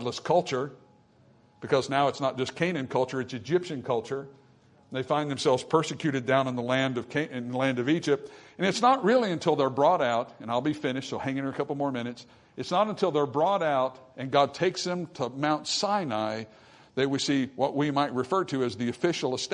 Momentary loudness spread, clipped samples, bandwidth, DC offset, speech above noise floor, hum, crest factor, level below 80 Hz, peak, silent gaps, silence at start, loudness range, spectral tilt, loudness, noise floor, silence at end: 10 LU; under 0.1%; 11 kHz; under 0.1%; 32 dB; none; 20 dB; -70 dBFS; -8 dBFS; none; 0 s; 4 LU; -5 dB/octave; -28 LUFS; -60 dBFS; 0 s